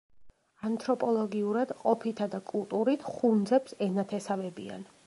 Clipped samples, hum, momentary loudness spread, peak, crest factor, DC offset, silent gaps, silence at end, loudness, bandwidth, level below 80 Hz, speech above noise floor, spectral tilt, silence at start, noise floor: under 0.1%; none; 8 LU; -12 dBFS; 18 dB; under 0.1%; none; 0.25 s; -30 LUFS; 11.5 kHz; -74 dBFS; 25 dB; -7 dB/octave; 0.15 s; -55 dBFS